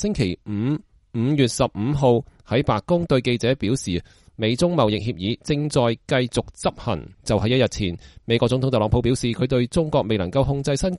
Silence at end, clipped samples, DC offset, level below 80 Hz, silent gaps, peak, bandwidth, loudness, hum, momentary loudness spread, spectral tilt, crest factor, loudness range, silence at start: 0 s; under 0.1%; under 0.1%; -40 dBFS; none; -4 dBFS; 11.5 kHz; -22 LUFS; none; 7 LU; -6 dB/octave; 18 dB; 1 LU; 0 s